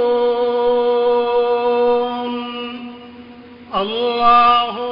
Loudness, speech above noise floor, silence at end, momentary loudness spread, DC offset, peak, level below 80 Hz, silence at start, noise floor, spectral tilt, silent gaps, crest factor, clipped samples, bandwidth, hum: -16 LUFS; 24 dB; 0 s; 16 LU; under 0.1%; -2 dBFS; -50 dBFS; 0 s; -39 dBFS; -6.5 dB/octave; none; 14 dB; under 0.1%; 5.4 kHz; none